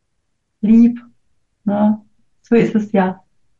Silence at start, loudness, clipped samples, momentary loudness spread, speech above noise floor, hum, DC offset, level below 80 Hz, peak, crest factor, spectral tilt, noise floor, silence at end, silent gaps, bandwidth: 0.65 s; -16 LUFS; under 0.1%; 14 LU; 58 dB; none; under 0.1%; -52 dBFS; -4 dBFS; 14 dB; -9 dB/octave; -71 dBFS; 0.45 s; none; 7 kHz